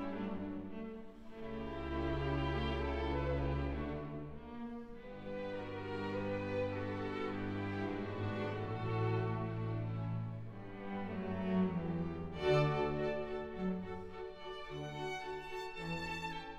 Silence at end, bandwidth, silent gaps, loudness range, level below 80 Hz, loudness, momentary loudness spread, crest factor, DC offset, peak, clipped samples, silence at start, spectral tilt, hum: 0 s; 9.6 kHz; none; 5 LU; -50 dBFS; -40 LUFS; 11 LU; 18 dB; under 0.1%; -20 dBFS; under 0.1%; 0 s; -7.5 dB/octave; none